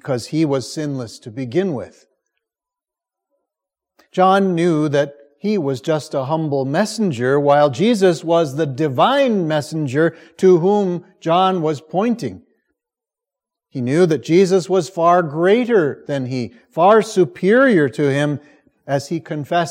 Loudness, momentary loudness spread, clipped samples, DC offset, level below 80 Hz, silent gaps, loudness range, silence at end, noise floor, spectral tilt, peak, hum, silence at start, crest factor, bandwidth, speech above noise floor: -17 LUFS; 11 LU; under 0.1%; under 0.1%; -68 dBFS; none; 6 LU; 0 s; -87 dBFS; -6.5 dB/octave; -2 dBFS; none; 0.05 s; 16 dB; 14.5 kHz; 70 dB